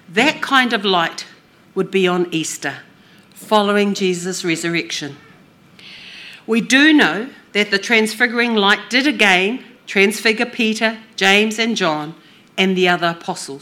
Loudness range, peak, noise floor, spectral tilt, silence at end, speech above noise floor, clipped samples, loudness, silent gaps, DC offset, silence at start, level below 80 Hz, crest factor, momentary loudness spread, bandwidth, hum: 6 LU; 0 dBFS; -47 dBFS; -3.5 dB/octave; 0.05 s; 31 dB; under 0.1%; -16 LUFS; none; under 0.1%; 0.1 s; -68 dBFS; 18 dB; 16 LU; 18 kHz; none